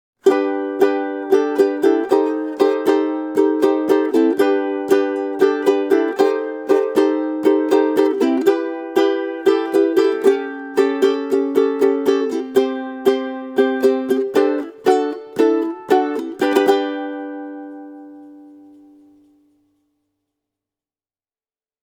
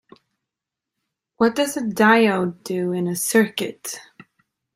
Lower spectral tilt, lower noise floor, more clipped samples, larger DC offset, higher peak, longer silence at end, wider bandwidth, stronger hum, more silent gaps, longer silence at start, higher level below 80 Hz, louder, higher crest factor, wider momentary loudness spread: about the same, -4.5 dB/octave vs -4.5 dB/octave; first, under -90 dBFS vs -86 dBFS; neither; neither; about the same, 0 dBFS vs -2 dBFS; first, 3.35 s vs 0.75 s; about the same, 16.5 kHz vs 16 kHz; neither; neither; second, 0.25 s vs 1.4 s; second, -72 dBFS vs -66 dBFS; first, -17 LUFS vs -20 LUFS; about the same, 18 dB vs 20 dB; second, 7 LU vs 14 LU